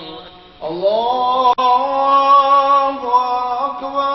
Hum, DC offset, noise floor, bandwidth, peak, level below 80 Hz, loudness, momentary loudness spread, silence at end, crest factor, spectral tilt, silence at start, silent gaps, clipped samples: none; under 0.1%; -37 dBFS; 6 kHz; -2 dBFS; -54 dBFS; -14 LUFS; 10 LU; 0 s; 14 dB; -1 dB/octave; 0 s; none; under 0.1%